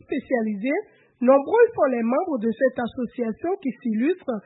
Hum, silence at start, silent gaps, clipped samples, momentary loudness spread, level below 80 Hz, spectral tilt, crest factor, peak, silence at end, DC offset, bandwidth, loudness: none; 0.1 s; none; under 0.1%; 10 LU; -64 dBFS; -11 dB/octave; 16 dB; -6 dBFS; 0.05 s; under 0.1%; 4 kHz; -23 LUFS